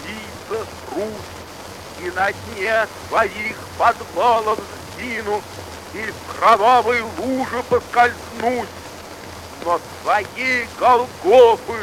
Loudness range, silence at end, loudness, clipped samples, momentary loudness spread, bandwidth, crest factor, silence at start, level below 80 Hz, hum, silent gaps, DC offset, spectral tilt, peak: 4 LU; 0 s; -19 LUFS; under 0.1%; 19 LU; 16 kHz; 20 dB; 0 s; -50 dBFS; none; none; under 0.1%; -4 dB/octave; 0 dBFS